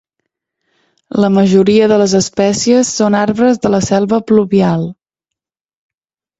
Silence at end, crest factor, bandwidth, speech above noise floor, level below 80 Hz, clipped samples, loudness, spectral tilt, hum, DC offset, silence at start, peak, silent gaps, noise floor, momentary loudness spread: 1.45 s; 12 dB; 8.2 kHz; 78 dB; -48 dBFS; under 0.1%; -12 LUFS; -5.5 dB/octave; none; under 0.1%; 1.15 s; 0 dBFS; none; -88 dBFS; 6 LU